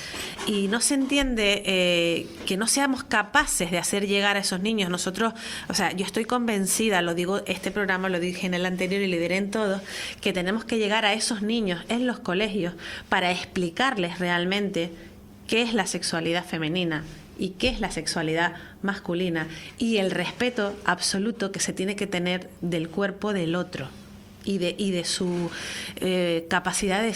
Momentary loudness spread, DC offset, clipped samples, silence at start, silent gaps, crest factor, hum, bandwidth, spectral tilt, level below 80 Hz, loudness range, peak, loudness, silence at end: 8 LU; under 0.1%; under 0.1%; 0 s; none; 22 dB; none; 16 kHz; -3.5 dB/octave; -50 dBFS; 5 LU; -4 dBFS; -25 LUFS; 0 s